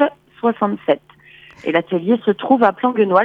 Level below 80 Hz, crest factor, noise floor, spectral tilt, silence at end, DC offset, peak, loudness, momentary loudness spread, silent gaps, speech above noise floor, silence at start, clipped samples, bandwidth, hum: -64 dBFS; 16 dB; -45 dBFS; -8 dB/octave; 0 s; under 0.1%; -2 dBFS; -18 LUFS; 7 LU; none; 29 dB; 0 s; under 0.1%; 5.2 kHz; none